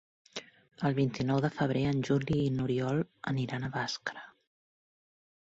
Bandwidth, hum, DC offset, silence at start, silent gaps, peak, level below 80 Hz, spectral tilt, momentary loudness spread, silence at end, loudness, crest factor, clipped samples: 7.8 kHz; none; under 0.1%; 0.35 s; none; -16 dBFS; -60 dBFS; -6.5 dB/octave; 15 LU; 1.3 s; -32 LUFS; 16 dB; under 0.1%